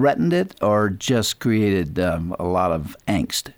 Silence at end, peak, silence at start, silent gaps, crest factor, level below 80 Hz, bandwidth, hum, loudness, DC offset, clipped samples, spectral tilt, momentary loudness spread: 0.05 s; -6 dBFS; 0 s; none; 14 dB; -44 dBFS; over 20 kHz; none; -21 LUFS; under 0.1%; under 0.1%; -5.5 dB/octave; 5 LU